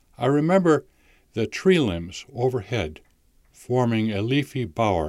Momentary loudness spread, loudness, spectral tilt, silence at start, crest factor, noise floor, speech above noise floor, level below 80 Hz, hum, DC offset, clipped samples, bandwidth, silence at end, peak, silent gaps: 10 LU; -23 LUFS; -6.5 dB/octave; 0.2 s; 16 dB; -58 dBFS; 36 dB; -50 dBFS; none; under 0.1%; under 0.1%; 14 kHz; 0 s; -6 dBFS; none